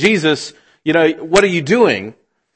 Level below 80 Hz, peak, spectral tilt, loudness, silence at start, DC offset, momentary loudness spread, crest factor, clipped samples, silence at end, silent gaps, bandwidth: -50 dBFS; 0 dBFS; -4.5 dB/octave; -14 LUFS; 0 s; under 0.1%; 11 LU; 16 dB; under 0.1%; 0.45 s; none; 11 kHz